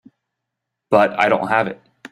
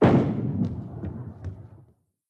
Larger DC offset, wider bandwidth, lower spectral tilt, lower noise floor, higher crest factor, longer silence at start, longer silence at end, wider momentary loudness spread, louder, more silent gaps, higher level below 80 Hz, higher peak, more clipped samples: neither; first, 12 kHz vs 7.6 kHz; second, -6 dB/octave vs -9.5 dB/octave; first, -80 dBFS vs -58 dBFS; about the same, 18 dB vs 20 dB; first, 0.9 s vs 0 s; second, 0.05 s vs 0.65 s; second, 11 LU vs 18 LU; first, -17 LUFS vs -27 LUFS; neither; second, -62 dBFS vs -48 dBFS; first, -2 dBFS vs -6 dBFS; neither